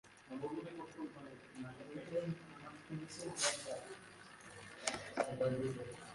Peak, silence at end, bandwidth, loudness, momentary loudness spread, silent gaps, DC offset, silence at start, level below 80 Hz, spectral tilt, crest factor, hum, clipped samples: -18 dBFS; 0 s; 11.5 kHz; -43 LUFS; 17 LU; none; under 0.1%; 0.05 s; -74 dBFS; -3.5 dB/octave; 26 dB; none; under 0.1%